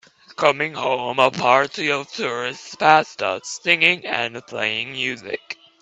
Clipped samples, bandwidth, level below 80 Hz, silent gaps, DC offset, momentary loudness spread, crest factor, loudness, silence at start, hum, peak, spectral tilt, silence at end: under 0.1%; 8.8 kHz; -66 dBFS; none; under 0.1%; 12 LU; 20 dB; -20 LUFS; 0.3 s; none; 0 dBFS; -3 dB/octave; 0.3 s